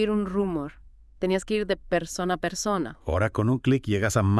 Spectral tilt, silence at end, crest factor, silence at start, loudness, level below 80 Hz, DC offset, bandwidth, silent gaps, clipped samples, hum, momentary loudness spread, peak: -6 dB/octave; 0 s; 16 dB; 0 s; -26 LUFS; -46 dBFS; under 0.1%; 12 kHz; none; under 0.1%; none; 5 LU; -10 dBFS